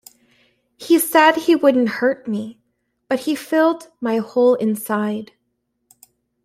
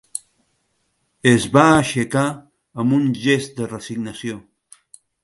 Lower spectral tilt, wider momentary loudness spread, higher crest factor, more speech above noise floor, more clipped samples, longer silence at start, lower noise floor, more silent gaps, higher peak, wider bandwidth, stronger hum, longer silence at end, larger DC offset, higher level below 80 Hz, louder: about the same, -4.5 dB/octave vs -5.5 dB/octave; second, 13 LU vs 18 LU; about the same, 18 dB vs 20 dB; first, 55 dB vs 51 dB; neither; first, 0.8 s vs 0.15 s; first, -72 dBFS vs -68 dBFS; neither; about the same, -2 dBFS vs 0 dBFS; first, 16 kHz vs 11.5 kHz; first, 60 Hz at -45 dBFS vs none; first, 1.2 s vs 0.85 s; neither; second, -68 dBFS vs -52 dBFS; about the same, -18 LUFS vs -18 LUFS